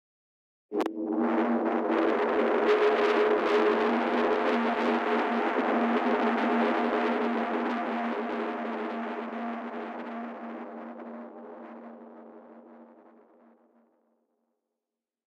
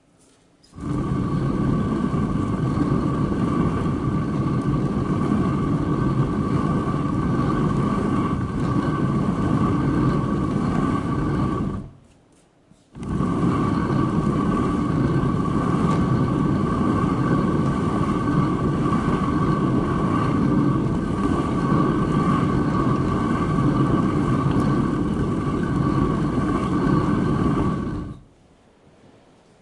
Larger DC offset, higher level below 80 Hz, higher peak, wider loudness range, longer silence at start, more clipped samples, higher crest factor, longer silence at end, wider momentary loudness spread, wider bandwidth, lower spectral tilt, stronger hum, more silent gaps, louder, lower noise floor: neither; second, -76 dBFS vs -36 dBFS; second, -14 dBFS vs -6 dBFS; first, 17 LU vs 3 LU; about the same, 0.7 s vs 0.75 s; neither; about the same, 14 dB vs 14 dB; first, 2.5 s vs 1.4 s; first, 17 LU vs 3 LU; second, 8.2 kHz vs 11 kHz; second, -5.5 dB/octave vs -8.5 dB/octave; neither; neither; second, -27 LUFS vs -22 LUFS; first, -89 dBFS vs -56 dBFS